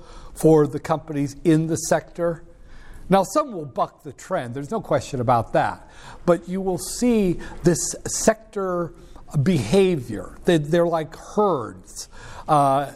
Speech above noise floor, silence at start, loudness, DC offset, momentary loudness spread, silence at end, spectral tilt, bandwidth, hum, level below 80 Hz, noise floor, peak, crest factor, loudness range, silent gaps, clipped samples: 19 dB; 0 s; -22 LUFS; under 0.1%; 11 LU; 0 s; -5.5 dB/octave; 16 kHz; none; -44 dBFS; -40 dBFS; -4 dBFS; 18 dB; 3 LU; none; under 0.1%